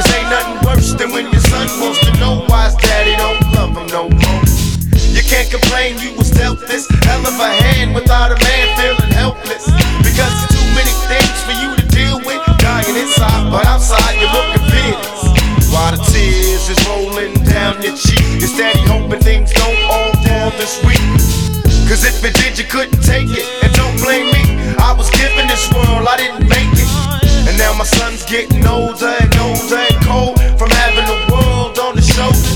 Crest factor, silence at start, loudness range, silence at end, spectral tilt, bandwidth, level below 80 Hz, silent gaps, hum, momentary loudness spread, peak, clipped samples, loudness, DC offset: 10 dB; 0 s; 1 LU; 0 s; -4.5 dB/octave; 19 kHz; -14 dBFS; none; none; 4 LU; 0 dBFS; under 0.1%; -12 LUFS; under 0.1%